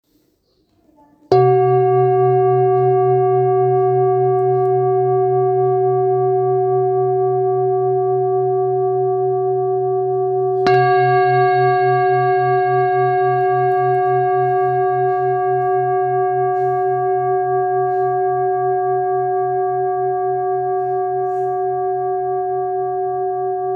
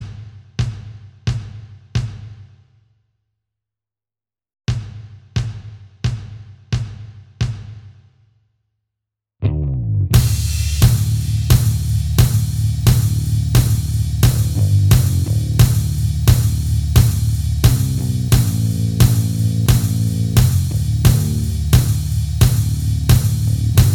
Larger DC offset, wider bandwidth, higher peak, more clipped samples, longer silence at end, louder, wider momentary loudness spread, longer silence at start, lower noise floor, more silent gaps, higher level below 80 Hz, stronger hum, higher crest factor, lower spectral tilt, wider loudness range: neither; second, 5.2 kHz vs 18.5 kHz; about the same, -2 dBFS vs 0 dBFS; neither; about the same, 0 s vs 0 s; about the same, -17 LUFS vs -17 LUFS; second, 6 LU vs 13 LU; first, 1.3 s vs 0 s; second, -61 dBFS vs under -90 dBFS; neither; second, -64 dBFS vs -24 dBFS; neither; about the same, 14 dB vs 16 dB; first, -9.5 dB/octave vs -5.5 dB/octave; second, 4 LU vs 14 LU